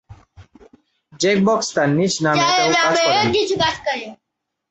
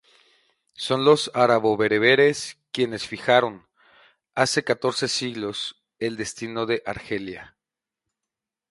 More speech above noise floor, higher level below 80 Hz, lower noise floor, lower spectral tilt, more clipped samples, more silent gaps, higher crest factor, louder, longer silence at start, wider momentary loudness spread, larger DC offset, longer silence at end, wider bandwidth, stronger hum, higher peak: second, 62 dB vs 66 dB; first, -52 dBFS vs -62 dBFS; second, -79 dBFS vs -88 dBFS; about the same, -4 dB/octave vs -4 dB/octave; neither; neither; second, 16 dB vs 22 dB; first, -17 LUFS vs -23 LUFS; second, 0.1 s vs 0.8 s; second, 9 LU vs 13 LU; neither; second, 0.55 s vs 1.25 s; second, 8.2 kHz vs 11.5 kHz; neither; about the same, -2 dBFS vs -2 dBFS